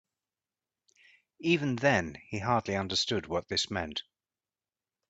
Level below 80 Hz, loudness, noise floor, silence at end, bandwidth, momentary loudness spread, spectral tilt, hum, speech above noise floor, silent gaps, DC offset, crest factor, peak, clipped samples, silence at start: -64 dBFS; -30 LUFS; under -90 dBFS; 1.1 s; 9.2 kHz; 9 LU; -4.5 dB/octave; none; over 60 dB; none; under 0.1%; 22 dB; -12 dBFS; under 0.1%; 1.4 s